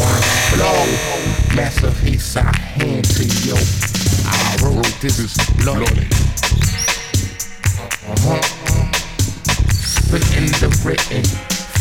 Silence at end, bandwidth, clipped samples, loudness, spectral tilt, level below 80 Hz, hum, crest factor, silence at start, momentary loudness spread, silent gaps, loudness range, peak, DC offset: 0 s; 18 kHz; under 0.1%; -16 LUFS; -4 dB/octave; -22 dBFS; none; 14 dB; 0 s; 5 LU; none; 2 LU; 0 dBFS; under 0.1%